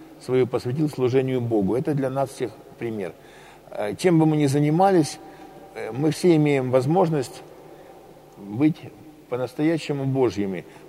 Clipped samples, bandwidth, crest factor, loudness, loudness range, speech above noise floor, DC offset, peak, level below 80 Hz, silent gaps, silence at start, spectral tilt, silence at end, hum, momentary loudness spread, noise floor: under 0.1%; 15 kHz; 18 dB; -23 LUFS; 5 LU; 24 dB; under 0.1%; -6 dBFS; -62 dBFS; none; 0 s; -7 dB/octave; 0 s; none; 16 LU; -46 dBFS